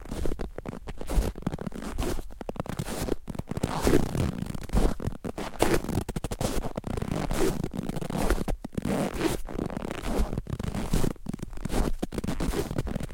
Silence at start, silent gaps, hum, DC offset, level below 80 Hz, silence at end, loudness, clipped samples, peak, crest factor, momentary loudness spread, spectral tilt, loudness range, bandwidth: 0 s; none; none; 0.1%; -34 dBFS; 0 s; -31 LUFS; under 0.1%; -4 dBFS; 26 dB; 9 LU; -6 dB/octave; 3 LU; 17 kHz